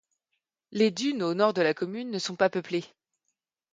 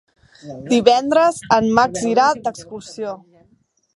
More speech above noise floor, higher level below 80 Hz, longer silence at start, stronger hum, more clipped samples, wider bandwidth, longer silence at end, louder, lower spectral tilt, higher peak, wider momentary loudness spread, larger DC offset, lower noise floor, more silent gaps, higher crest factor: first, 55 dB vs 43 dB; second, -76 dBFS vs -56 dBFS; first, 0.7 s vs 0.45 s; neither; neither; second, 9.4 kHz vs 11.5 kHz; about the same, 0.85 s vs 0.8 s; second, -27 LUFS vs -16 LUFS; about the same, -5 dB/octave vs -4 dB/octave; second, -8 dBFS vs 0 dBFS; second, 9 LU vs 20 LU; neither; first, -82 dBFS vs -60 dBFS; neither; about the same, 20 dB vs 18 dB